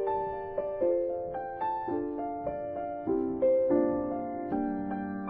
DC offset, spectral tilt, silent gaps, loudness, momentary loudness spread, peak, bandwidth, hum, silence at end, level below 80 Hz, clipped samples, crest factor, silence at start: under 0.1%; -8 dB/octave; none; -31 LUFS; 9 LU; -16 dBFS; 3.8 kHz; none; 0 s; -58 dBFS; under 0.1%; 16 dB; 0 s